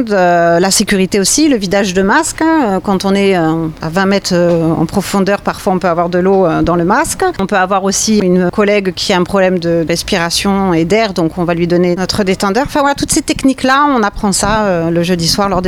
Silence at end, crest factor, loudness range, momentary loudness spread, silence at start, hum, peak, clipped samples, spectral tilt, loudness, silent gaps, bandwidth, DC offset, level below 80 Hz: 0 s; 10 dB; 2 LU; 4 LU; 0 s; none; -2 dBFS; under 0.1%; -4.5 dB/octave; -12 LUFS; none; 16.5 kHz; under 0.1%; -34 dBFS